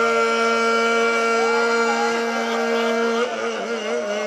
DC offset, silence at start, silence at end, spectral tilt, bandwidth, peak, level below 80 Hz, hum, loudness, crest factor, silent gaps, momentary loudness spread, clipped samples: under 0.1%; 0 s; 0 s; -2.5 dB/octave; 13 kHz; -8 dBFS; -70 dBFS; none; -20 LUFS; 12 dB; none; 6 LU; under 0.1%